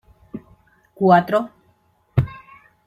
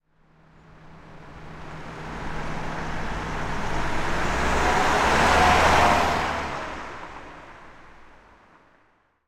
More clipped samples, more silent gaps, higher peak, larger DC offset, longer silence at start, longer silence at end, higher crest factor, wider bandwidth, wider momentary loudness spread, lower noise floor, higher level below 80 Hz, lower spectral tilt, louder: neither; neither; first, -2 dBFS vs -6 dBFS; neither; second, 0.35 s vs 0.85 s; second, 0.5 s vs 1.25 s; about the same, 20 dB vs 20 dB; second, 14 kHz vs 15.5 kHz; about the same, 23 LU vs 24 LU; about the same, -61 dBFS vs -63 dBFS; second, -48 dBFS vs -36 dBFS; first, -9 dB/octave vs -4 dB/octave; first, -19 LUFS vs -23 LUFS